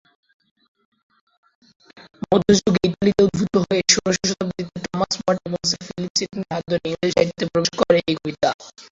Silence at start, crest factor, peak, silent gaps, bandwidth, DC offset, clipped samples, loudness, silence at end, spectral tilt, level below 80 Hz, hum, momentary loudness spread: 1.95 s; 20 dB; 0 dBFS; 6.10-6.15 s, 8.54-8.59 s; 7.8 kHz; under 0.1%; under 0.1%; -20 LUFS; 0.1 s; -4 dB/octave; -50 dBFS; none; 10 LU